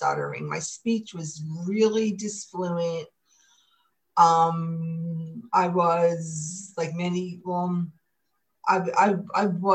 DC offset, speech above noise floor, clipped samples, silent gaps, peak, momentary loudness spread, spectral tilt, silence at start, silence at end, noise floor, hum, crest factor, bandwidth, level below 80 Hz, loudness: under 0.1%; 53 dB; under 0.1%; none; -4 dBFS; 12 LU; -5.5 dB/octave; 0 s; 0 s; -78 dBFS; none; 20 dB; 9.4 kHz; -74 dBFS; -26 LUFS